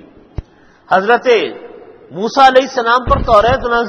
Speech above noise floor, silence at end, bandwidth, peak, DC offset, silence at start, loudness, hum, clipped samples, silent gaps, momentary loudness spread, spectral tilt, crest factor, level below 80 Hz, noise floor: 24 dB; 0 s; 9.6 kHz; 0 dBFS; under 0.1%; 0.4 s; -12 LUFS; none; 0.3%; none; 23 LU; -5 dB/octave; 14 dB; -30 dBFS; -36 dBFS